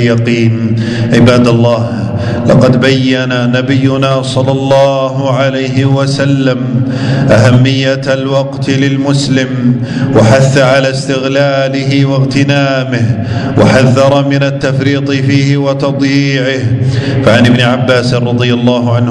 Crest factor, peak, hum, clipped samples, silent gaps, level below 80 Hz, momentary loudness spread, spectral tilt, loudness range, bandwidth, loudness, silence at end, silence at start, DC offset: 8 dB; 0 dBFS; none; 2%; none; -38 dBFS; 6 LU; -6.5 dB/octave; 1 LU; 10.5 kHz; -9 LUFS; 0 s; 0 s; under 0.1%